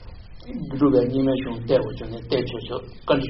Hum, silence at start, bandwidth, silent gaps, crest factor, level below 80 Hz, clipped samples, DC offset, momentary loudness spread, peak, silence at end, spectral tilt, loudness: none; 0 s; 5.8 kHz; none; 18 dB; -42 dBFS; under 0.1%; under 0.1%; 15 LU; -4 dBFS; 0 s; -6 dB/octave; -23 LUFS